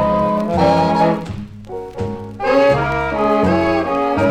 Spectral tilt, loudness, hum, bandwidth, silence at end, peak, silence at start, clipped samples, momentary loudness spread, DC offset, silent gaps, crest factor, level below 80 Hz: -7.5 dB/octave; -16 LUFS; none; 13 kHz; 0 s; -4 dBFS; 0 s; under 0.1%; 15 LU; under 0.1%; none; 14 dB; -38 dBFS